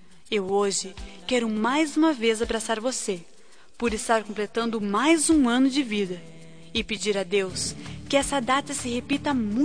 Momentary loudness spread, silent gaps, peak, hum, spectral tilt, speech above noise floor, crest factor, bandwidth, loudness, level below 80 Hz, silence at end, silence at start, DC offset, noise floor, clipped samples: 10 LU; none; -8 dBFS; none; -3.5 dB/octave; 28 dB; 18 dB; 10.5 kHz; -25 LUFS; -48 dBFS; 0 s; 0.3 s; 0.5%; -52 dBFS; under 0.1%